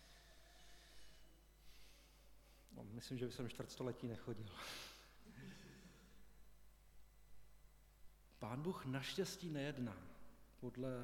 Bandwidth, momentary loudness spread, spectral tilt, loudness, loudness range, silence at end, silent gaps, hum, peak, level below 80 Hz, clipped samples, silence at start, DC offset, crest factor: 18 kHz; 22 LU; -5.5 dB/octave; -49 LUFS; 13 LU; 0 s; none; none; -30 dBFS; -68 dBFS; under 0.1%; 0 s; under 0.1%; 20 dB